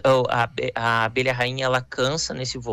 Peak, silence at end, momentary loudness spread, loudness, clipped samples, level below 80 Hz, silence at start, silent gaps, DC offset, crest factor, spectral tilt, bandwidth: -10 dBFS; 0 s; 5 LU; -23 LUFS; under 0.1%; -52 dBFS; 0.05 s; none; under 0.1%; 12 dB; -4 dB/octave; 14 kHz